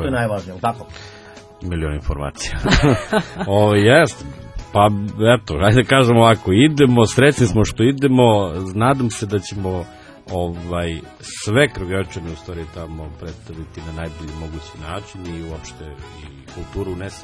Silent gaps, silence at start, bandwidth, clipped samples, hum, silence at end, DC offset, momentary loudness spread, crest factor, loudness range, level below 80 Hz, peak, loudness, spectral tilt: none; 0 s; 11 kHz; under 0.1%; none; 0 s; under 0.1%; 21 LU; 18 dB; 17 LU; -34 dBFS; 0 dBFS; -17 LUFS; -6 dB/octave